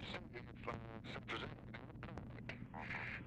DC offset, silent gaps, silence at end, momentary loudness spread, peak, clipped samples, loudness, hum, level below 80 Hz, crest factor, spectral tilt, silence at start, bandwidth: under 0.1%; none; 0 s; 7 LU; -30 dBFS; under 0.1%; -49 LUFS; none; -62 dBFS; 20 dB; -6 dB/octave; 0 s; 10.5 kHz